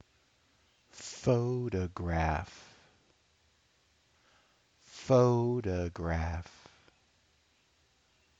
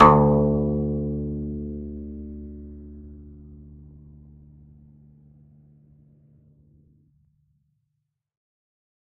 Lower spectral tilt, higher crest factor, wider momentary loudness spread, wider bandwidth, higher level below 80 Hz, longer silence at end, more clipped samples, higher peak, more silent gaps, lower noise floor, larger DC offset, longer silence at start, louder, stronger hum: second, -7 dB/octave vs -9.5 dB/octave; about the same, 22 dB vs 26 dB; second, 22 LU vs 27 LU; first, 8 kHz vs 4.6 kHz; second, -50 dBFS vs -40 dBFS; second, 1.95 s vs 5.3 s; neither; second, -14 dBFS vs 0 dBFS; neither; second, -70 dBFS vs -78 dBFS; neither; first, 0.95 s vs 0 s; second, -32 LUFS vs -24 LUFS; neither